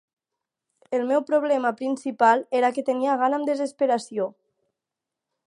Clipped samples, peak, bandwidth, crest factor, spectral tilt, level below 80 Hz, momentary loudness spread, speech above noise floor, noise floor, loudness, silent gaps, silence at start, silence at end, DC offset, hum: under 0.1%; -6 dBFS; 11 kHz; 20 dB; -4.5 dB/octave; -82 dBFS; 9 LU; 64 dB; -87 dBFS; -23 LUFS; none; 0.9 s; 1.2 s; under 0.1%; none